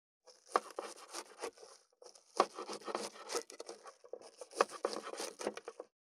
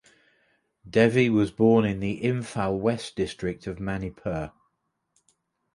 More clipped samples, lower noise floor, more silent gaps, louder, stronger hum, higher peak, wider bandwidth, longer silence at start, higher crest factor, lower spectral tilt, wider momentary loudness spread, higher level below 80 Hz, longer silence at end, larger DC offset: neither; second, -62 dBFS vs -76 dBFS; neither; second, -41 LUFS vs -25 LUFS; neither; second, -12 dBFS vs -6 dBFS; first, 16 kHz vs 11.5 kHz; second, 0.25 s vs 0.85 s; first, 32 dB vs 20 dB; second, -1.5 dB/octave vs -7 dB/octave; first, 18 LU vs 12 LU; second, under -90 dBFS vs -52 dBFS; second, 0.2 s vs 1.25 s; neither